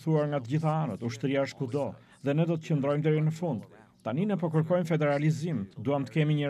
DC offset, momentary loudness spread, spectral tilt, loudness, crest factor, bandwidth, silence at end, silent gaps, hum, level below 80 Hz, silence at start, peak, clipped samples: under 0.1%; 7 LU; -8 dB/octave; -29 LUFS; 14 dB; 10.5 kHz; 0 s; none; none; -74 dBFS; 0 s; -14 dBFS; under 0.1%